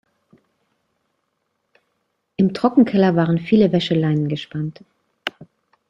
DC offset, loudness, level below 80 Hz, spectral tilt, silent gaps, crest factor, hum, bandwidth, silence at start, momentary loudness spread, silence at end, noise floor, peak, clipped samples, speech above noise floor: under 0.1%; -19 LUFS; -58 dBFS; -8 dB/octave; none; 18 dB; none; 7.6 kHz; 2.4 s; 15 LU; 0.45 s; -72 dBFS; -2 dBFS; under 0.1%; 55 dB